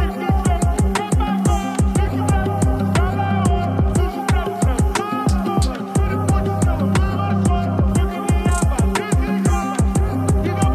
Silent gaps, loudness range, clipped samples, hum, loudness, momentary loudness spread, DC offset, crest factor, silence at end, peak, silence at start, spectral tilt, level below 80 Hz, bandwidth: none; 1 LU; under 0.1%; none; -19 LUFS; 2 LU; under 0.1%; 14 dB; 0 s; -4 dBFS; 0 s; -6.5 dB/octave; -22 dBFS; 14.5 kHz